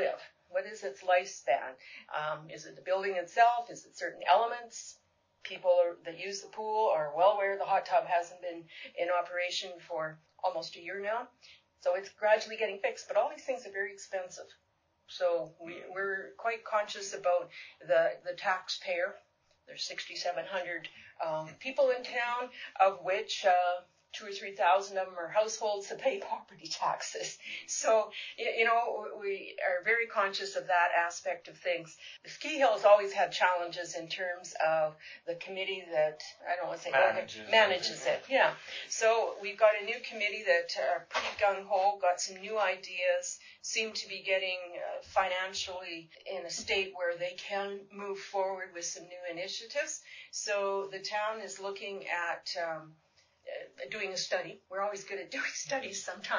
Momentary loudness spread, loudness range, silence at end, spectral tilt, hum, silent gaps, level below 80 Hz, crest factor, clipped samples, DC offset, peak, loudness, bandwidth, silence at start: 14 LU; 7 LU; 0 s; -1.5 dB/octave; none; none; -78 dBFS; 22 dB; under 0.1%; under 0.1%; -10 dBFS; -32 LUFS; 7.6 kHz; 0 s